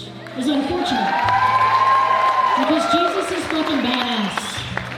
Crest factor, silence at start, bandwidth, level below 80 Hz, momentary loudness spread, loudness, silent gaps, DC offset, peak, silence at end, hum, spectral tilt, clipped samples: 16 dB; 0 s; 14.5 kHz; -50 dBFS; 9 LU; -18 LUFS; none; under 0.1%; -2 dBFS; 0 s; none; -4 dB/octave; under 0.1%